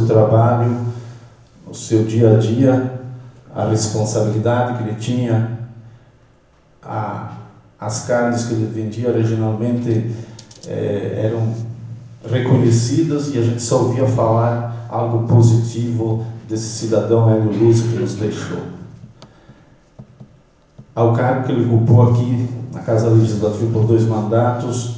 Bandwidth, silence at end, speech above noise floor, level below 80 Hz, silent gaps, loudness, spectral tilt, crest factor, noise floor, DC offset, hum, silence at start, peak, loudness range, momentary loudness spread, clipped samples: 8 kHz; 0 s; 36 dB; -48 dBFS; none; -17 LUFS; -7.5 dB/octave; 16 dB; -52 dBFS; under 0.1%; none; 0 s; -2 dBFS; 7 LU; 17 LU; under 0.1%